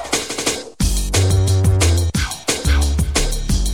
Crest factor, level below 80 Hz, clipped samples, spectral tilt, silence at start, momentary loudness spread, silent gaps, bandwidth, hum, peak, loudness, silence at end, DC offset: 14 dB; -22 dBFS; under 0.1%; -4 dB/octave; 0 s; 5 LU; none; 17 kHz; none; -4 dBFS; -18 LUFS; 0 s; 0.5%